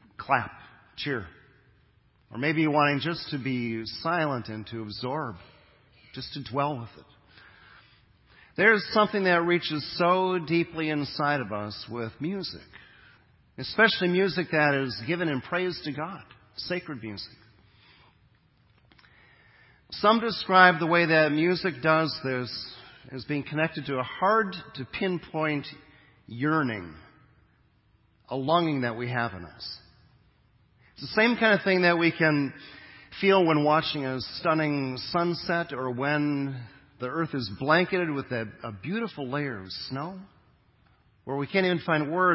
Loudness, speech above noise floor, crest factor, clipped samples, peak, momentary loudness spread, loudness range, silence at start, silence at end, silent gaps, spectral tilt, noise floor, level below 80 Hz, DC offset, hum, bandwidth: -26 LUFS; 38 dB; 26 dB; under 0.1%; -2 dBFS; 17 LU; 10 LU; 0.2 s; 0 s; none; -9.5 dB/octave; -64 dBFS; -62 dBFS; under 0.1%; none; 5.8 kHz